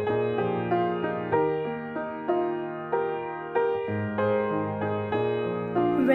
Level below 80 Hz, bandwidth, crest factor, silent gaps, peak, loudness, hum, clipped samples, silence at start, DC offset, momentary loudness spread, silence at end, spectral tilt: -62 dBFS; 4.8 kHz; 16 dB; none; -10 dBFS; -28 LUFS; none; under 0.1%; 0 s; under 0.1%; 6 LU; 0 s; -9.5 dB/octave